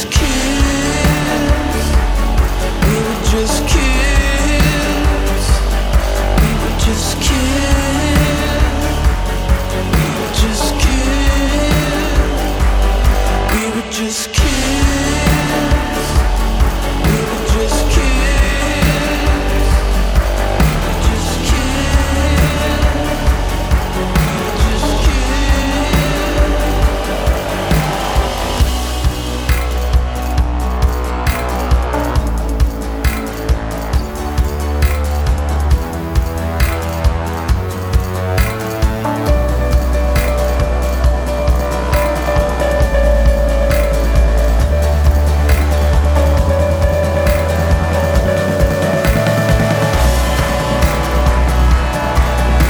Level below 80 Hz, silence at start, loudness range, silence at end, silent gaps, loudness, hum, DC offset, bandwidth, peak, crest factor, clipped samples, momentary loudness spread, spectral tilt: -16 dBFS; 0 s; 3 LU; 0 s; none; -15 LUFS; none; under 0.1%; over 20 kHz; 0 dBFS; 12 dB; under 0.1%; 4 LU; -5 dB/octave